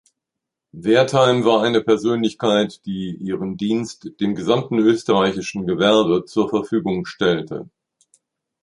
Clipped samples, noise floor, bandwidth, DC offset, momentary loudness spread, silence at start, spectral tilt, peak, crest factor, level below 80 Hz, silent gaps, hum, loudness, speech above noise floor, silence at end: under 0.1%; -83 dBFS; 11 kHz; under 0.1%; 11 LU; 0.75 s; -5.5 dB/octave; -2 dBFS; 18 dB; -56 dBFS; none; none; -19 LUFS; 65 dB; 1 s